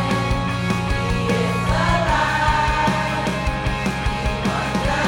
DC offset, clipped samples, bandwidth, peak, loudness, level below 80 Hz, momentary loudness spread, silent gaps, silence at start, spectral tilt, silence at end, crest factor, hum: under 0.1%; under 0.1%; 17 kHz; -4 dBFS; -20 LUFS; -28 dBFS; 5 LU; none; 0 s; -5.5 dB/octave; 0 s; 16 dB; none